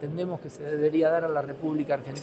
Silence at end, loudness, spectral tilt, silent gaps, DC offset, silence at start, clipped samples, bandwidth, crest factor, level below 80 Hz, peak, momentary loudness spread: 0 s; -28 LUFS; -7.5 dB/octave; none; under 0.1%; 0 s; under 0.1%; 8.2 kHz; 14 dB; -68 dBFS; -14 dBFS; 10 LU